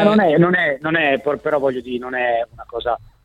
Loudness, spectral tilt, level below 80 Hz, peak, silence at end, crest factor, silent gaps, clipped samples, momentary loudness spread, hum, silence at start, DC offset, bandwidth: -18 LUFS; -7.5 dB/octave; -50 dBFS; -2 dBFS; 0.25 s; 16 dB; none; under 0.1%; 11 LU; none; 0 s; under 0.1%; 9.6 kHz